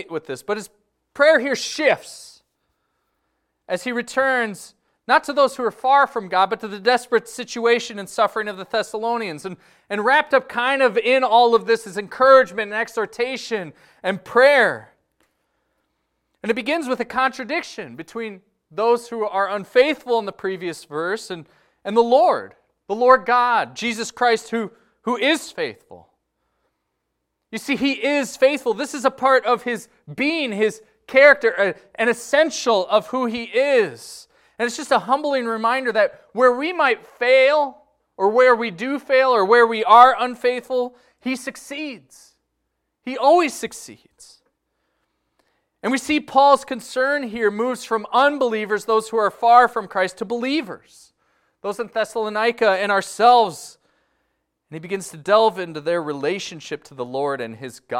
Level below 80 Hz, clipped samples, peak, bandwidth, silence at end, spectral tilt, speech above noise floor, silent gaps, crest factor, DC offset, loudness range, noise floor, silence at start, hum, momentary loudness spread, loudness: -66 dBFS; under 0.1%; 0 dBFS; 15.5 kHz; 0 s; -3.5 dB/octave; 57 dB; none; 20 dB; under 0.1%; 7 LU; -76 dBFS; 0 s; none; 16 LU; -19 LUFS